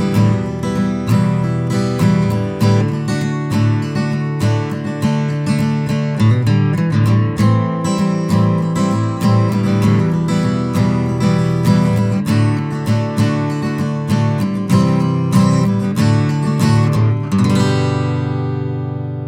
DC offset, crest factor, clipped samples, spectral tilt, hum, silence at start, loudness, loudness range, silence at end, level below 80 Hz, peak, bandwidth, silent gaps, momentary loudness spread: under 0.1%; 14 dB; under 0.1%; -7.5 dB/octave; none; 0 s; -16 LUFS; 2 LU; 0 s; -42 dBFS; 0 dBFS; 15.5 kHz; none; 5 LU